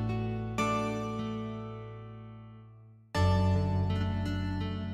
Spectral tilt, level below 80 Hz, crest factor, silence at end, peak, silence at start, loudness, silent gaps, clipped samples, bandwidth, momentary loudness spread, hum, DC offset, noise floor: -7 dB/octave; -46 dBFS; 16 dB; 0 s; -16 dBFS; 0 s; -32 LUFS; none; under 0.1%; 10.5 kHz; 19 LU; none; under 0.1%; -54 dBFS